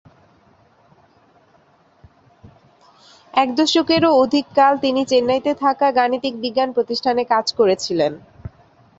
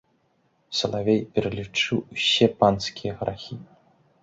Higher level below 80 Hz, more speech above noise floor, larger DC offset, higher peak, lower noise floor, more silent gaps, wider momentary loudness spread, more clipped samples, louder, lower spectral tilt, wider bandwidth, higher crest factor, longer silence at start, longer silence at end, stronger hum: about the same, -56 dBFS vs -54 dBFS; second, 38 dB vs 43 dB; neither; about the same, -2 dBFS vs -4 dBFS; second, -55 dBFS vs -67 dBFS; neither; second, 8 LU vs 12 LU; neither; first, -17 LUFS vs -24 LUFS; about the same, -4 dB/octave vs -4.5 dB/octave; about the same, 8 kHz vs 8 kHz; about the same, 18 dB vs 22 dB; first, 3.35 s vs 0.7 s; about the same, 0.5 s vs 0.6 s; neither